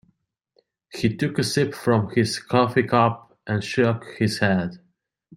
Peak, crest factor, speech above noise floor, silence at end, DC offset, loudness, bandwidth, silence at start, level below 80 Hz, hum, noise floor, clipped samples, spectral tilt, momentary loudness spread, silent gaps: -4 dBFS; 20 dB; 46 dB; 0.6 s; under 0.1%; -22 LUFS; 16 kHz; 0.95 s; -60 dBFS; none; -68 dBFS; under 0.1%; -6 dB/octave; 8 LU; none